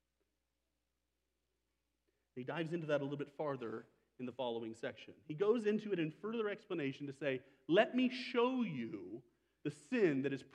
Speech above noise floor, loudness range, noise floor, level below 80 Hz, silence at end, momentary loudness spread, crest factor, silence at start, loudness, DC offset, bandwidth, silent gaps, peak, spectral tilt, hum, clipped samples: 49 dB; 7 LU; -87 dBFS; -88 dBFS; 0.1 s; 15 LU; 22 dB; 2.35 s; -39 LUFS; under 0.1%; 10 kHz; none; -18 dBFS; -6.5 dB/octave; none; under 0.1%